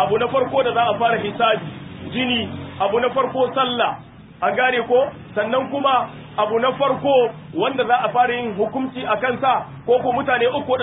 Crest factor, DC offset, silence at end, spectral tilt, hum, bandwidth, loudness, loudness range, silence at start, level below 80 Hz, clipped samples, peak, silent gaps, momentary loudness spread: 14 dB; under 0.1%; 0 s; -10 dB/octave; none; 4 kHz; -20 LUFS; 2 LU; 0 s; -52 dBFS; under 0.1%; -4 dBFS; none; 6 LU